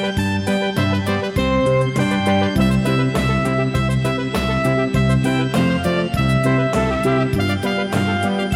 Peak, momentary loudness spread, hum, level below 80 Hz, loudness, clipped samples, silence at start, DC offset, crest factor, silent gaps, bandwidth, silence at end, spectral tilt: -6 dBFS; 3 LU; none; -34 dBFS; -18 LUFS; under 0.1%; 0 s; under 0.1%; 12 dB; none; 15.5 kHz; 0 s; -6.5 dB/octave